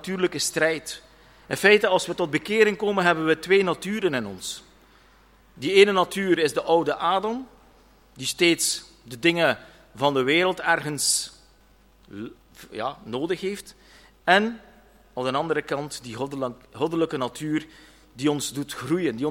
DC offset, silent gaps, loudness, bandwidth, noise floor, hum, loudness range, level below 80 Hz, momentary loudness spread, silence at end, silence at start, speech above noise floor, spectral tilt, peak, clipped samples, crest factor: under 0.1%; none; -23 LUFS; 16.5 kHz; -57 dBFS; none; 7 LU; -60 dBFS; 14 LU; 0 s; 0 s; 33 dB; -3.5 dB/octave; -2 dBFS; under 0.1%; 22 dB